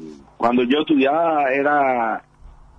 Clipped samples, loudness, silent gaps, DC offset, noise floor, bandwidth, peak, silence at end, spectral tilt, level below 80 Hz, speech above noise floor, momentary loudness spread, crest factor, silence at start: under 0.1%; -18 LUFS; none; under 0.1%; -45 dBFS; 7.4 kHz; -6 dBFS; 0.3 s; -6.5 dB/octave; -52 dBFS; 27 dB; 6 LU; 14 dB; 0 s